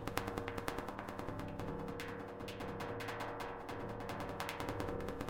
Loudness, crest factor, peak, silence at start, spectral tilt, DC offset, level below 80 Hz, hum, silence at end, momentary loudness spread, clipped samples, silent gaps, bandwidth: -44 LUFS; 26 dB; -16 dBFS; 0 s; -5.5 dB/octave; under 0.1%; -56 dBFS; none; 0 s; 4 LU; under 0.1%; none; 17 kHz